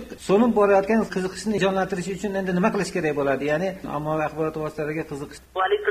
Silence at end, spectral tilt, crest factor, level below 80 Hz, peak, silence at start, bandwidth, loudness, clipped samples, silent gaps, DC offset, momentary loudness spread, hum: 0 s; -6 dB/octave; 18 dB; -50 dBFS; -6 dBFS; 0 s; 15 kHz; -23 LUFS; under 0.1%; none; under 0.1%; 10 LU; none